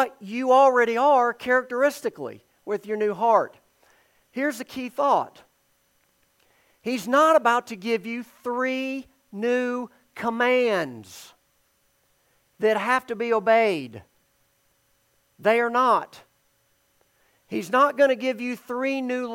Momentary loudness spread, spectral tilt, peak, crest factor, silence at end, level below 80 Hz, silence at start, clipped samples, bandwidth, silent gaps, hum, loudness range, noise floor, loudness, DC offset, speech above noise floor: 16 LU; -4.5 dB/octave; -6 dBFS; 18 dB; 0 s; -74 dBFS; 0 s; under 0.1%; 17 kHz; none; none; 4 LU; -67 dBFS; -23 LUFS; under 0.1%; 44 dB